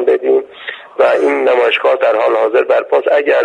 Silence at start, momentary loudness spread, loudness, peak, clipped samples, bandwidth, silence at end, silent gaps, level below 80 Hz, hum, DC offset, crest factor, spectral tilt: 0 s; 5 LU; -12 LUFS; 0 dBFS; under 0.1%; 9.2 kHz; 0 s; none; -64 dBFS; none; under 0.1%; 12 dB; -4 dB/octave